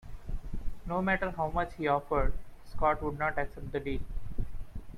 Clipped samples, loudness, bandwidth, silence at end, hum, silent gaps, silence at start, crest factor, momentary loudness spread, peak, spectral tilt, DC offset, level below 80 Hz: under 0.1%; -33 LUFS; 9.6 kHz; 0 s; none; none; 0.05 s; 16 dB; 15 LU; -14 dBFS; -7.5 dB/octave; under 0.1%; -38 dBFS